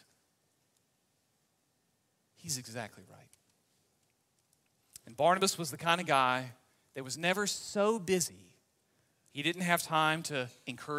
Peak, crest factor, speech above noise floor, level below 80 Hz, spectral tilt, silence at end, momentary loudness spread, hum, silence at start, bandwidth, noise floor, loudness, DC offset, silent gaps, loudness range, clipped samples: -10 dBFS; 26 dB; 44 dB; -78 dBFS; -3 dB/octave; 0 s; 18 LU; none; 2.45 s; 16 kHz; -77 dBFS; -32 LUFS; under 0.1%; none; 15 LU; under 0.1%